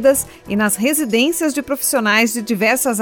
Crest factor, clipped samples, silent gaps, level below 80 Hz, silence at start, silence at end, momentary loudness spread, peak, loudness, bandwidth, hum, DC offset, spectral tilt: 14 dB; under 0.1%; none; -50 dBFS; 0 s; 0 s; 5 LU; -2 dBFS; -16 LUFS; 19 kHz; none; under 0.1%; -3 dB/octave